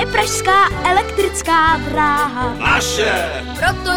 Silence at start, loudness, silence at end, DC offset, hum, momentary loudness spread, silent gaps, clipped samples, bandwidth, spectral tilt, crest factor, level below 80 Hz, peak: 0 s; -15 LUFS; 0 s; 0.7%; none; 6 LU; none; under 0.1%; over 20 kHz; -3 dB/octave; 16 dB; -32 dBFS; 0 dBFS